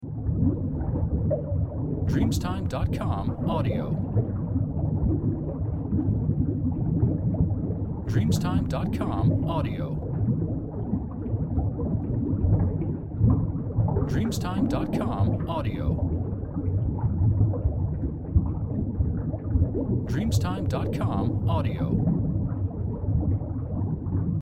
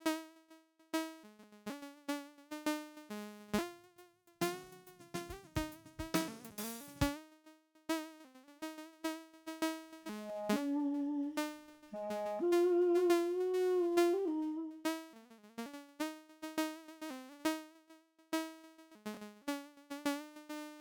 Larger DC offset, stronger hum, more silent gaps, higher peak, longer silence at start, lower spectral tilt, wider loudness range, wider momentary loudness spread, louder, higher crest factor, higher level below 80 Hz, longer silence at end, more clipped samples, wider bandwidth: neither; neither; neither; first, -8 dBFS vs -18 dBFS; about the same, 0 s vs 0 s; first, -8.5 dB/octave vs -4.5 dB/octave; second, 1 LU vs 10 LU; second, 5 LU vs 18 LU; first, -27 LUFS vs -39 LUFS; second, 16 dB vs 22 dB; first, -34 dBFS vs -62 dBFS; about the same, 0 s vs 0 s; neither; second, 12.5 kHz vs over 20 kHz